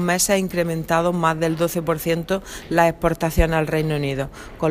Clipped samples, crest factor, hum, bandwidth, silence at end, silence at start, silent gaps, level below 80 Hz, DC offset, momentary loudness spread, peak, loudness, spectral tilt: under 0.1%; 18 dB; none; 15.5 kHz; 0 s; 0 s; none; -34 dBFS; under 0.1%; 7 LU; -2 dBFS; -21 LUFS; -5 dB/octave